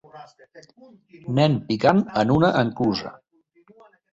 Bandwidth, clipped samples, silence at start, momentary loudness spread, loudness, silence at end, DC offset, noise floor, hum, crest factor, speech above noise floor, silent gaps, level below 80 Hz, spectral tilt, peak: 7.8 kHz; under 0.1%; 0.15 s; 11 LU; -21 LUFS; 1 s; under 0.1%; -57 dBFS; none; 20 dB; 36 dB; none; -54 dBFS; -7.5 dB/octave; -4 dBFS